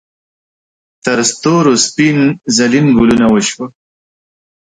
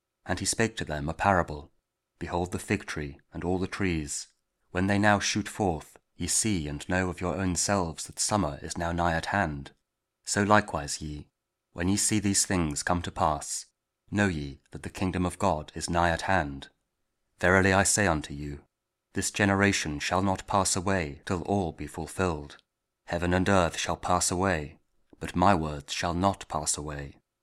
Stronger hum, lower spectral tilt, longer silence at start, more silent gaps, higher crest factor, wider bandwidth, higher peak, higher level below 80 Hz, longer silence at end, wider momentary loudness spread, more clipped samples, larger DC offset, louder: neither; about the same, -4 dB/octave vs -4 dB/octave; first, 1.05 s vs 0.25 s; neither; second, 12 dB vs 24 dB; second, 9.6 kHz vs 15.5 kHz; first, 0 dBFS vs -4 dBFS; about the same, -44 dBFS vs -48 dBFS; first, 1.1 s vs 0.3 s; second, 9 LU vs 14 LU; neither; neither; first, -11 LUFS vs -28 LUFS